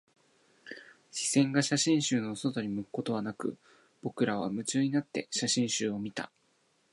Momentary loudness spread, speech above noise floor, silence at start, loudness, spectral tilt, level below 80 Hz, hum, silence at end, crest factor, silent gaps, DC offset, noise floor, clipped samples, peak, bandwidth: 16 LU; 40 dB; 0.65 s; -31 LUFS; -4 dB/octave; -74 dBFS; none; 0.65 s; 20 dB; none; under 0.1%; -71 dBFS; under 0.1%; -12 dBFS; 11.5 kHz